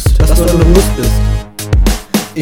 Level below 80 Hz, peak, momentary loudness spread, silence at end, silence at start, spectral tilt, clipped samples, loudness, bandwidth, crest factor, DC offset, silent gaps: -12 dBFS; 0 dBFS; 8 LU; 0 s; 0 s; -5.5 dB/octave; 1%; -12 LUFS; 18 kHz; 10 dB; 0.7%; none